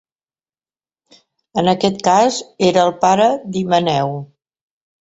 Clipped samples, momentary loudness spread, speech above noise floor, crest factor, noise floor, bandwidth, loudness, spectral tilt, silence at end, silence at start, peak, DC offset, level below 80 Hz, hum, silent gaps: under 0.1%; 8 LU; over 75 dB; 16 dB; under -90 dBFS; 8 kHz; -16 LUFS; -5 dB/octave; 0.8 s; 1.55 s; -2 dBFS; under 0.1%; -58 dBFS; none; none